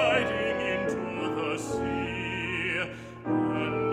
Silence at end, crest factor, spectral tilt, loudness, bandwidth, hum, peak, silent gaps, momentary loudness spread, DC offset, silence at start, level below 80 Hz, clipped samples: 0 s; 16 dB; -5.5 dB/octave; -29 LUFS; 13.5 kHz; none; -12 dBFS; none; 4 LU; under 0.1%; 0 s; -52 dBFS; under 0.1%